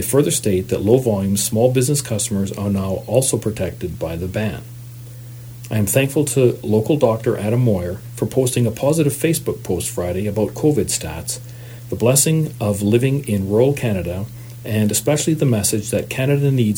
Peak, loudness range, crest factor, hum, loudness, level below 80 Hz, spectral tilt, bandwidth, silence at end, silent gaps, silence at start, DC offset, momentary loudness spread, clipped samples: 0 dBFS; 4 LU; 18 dB; none; -18 LUFS; -46 dBFS; -5.5 dB/octave; over 20 kHz; 0 s; none; 0 s; under 0.1%; 11 LU; under 0.1%